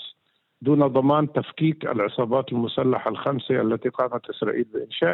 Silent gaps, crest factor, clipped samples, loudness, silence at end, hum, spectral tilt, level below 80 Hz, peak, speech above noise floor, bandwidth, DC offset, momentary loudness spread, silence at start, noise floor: none; 16 dB; under 0.1%; -23 LUFS; 0 s; none; -10 dB/octave; -68 dBFS; -8 dBFS; 42 dB; 4.2 kHz; under 0.1%; 8 LU; 0 s; -65 dBFS